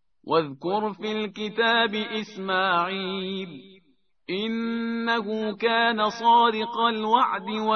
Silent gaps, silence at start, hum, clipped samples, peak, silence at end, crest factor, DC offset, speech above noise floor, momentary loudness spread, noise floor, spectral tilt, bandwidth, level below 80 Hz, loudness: none; 0.25 s; none; under 0.1%; -8 dBFS; 0 s; 16 dB; under 0.1%; 41 dB; 10 LU; -66 dBFS; -5 dB/octave; 6.6 kHz; -70 dBFS; -24 LUFS